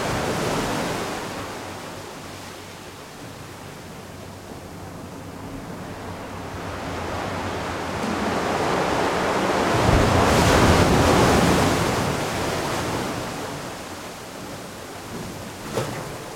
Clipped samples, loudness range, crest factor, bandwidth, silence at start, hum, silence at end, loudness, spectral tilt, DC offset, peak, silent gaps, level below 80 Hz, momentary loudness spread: under 0.1%; 18 LU; 20 dB; 16.5 kHz; 0 s; none; 0 s; -22 LUFS; -5 dB/octave; under 0.1%; -4 dBFS; none; -38 dBFS; 21 LU